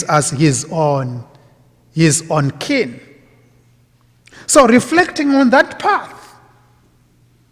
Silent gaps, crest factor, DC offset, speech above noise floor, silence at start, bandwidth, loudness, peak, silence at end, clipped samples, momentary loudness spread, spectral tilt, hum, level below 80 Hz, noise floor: none; 16 dB; under 0.1%; 39 dB; 0 s; 16 kHz; -14 LUFS; 0 dBFS; 1.35 s; under 0.1%; 15 LU; -4.5 dB/octave; none; -50 dBFS; -53 dBFS